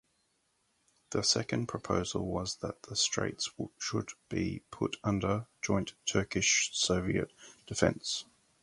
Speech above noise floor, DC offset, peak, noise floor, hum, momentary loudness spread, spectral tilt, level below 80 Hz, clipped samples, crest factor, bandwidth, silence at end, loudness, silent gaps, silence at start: 43 dB; under 0.1%; -10 dBFS; -76 dBFS; none; 10 LU; -3.5 dB/octave; -54 dBFS; under 0.1%; 24 dB; 11.5 kHz; 0.4 s; -32 LUFS; none; 1.1 s